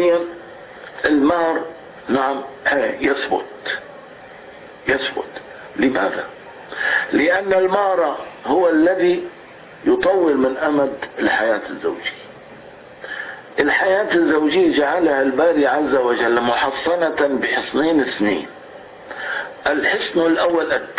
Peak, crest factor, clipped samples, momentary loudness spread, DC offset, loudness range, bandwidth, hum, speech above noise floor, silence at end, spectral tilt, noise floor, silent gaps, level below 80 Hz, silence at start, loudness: -4 dBFS; 16 dB; under 0.1%; 19 LU; under 0.1%; 6 LU; 4 kHz; none; 22 dB; 0 s; -8.5 dB/octave; -40 dBFS; none; -54 dBFS; 0 s; -18 LUFS